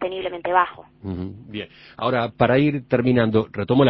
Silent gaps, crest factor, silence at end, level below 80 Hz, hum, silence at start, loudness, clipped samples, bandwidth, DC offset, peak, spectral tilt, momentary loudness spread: none; 20 dB; 0 s; -48 dBFS; none; 0 s; -21 LUFS; under 0.1%; 5.6 kHz; under 0.1%; -2 dBFS; -10.5 dB/octave; 16 LU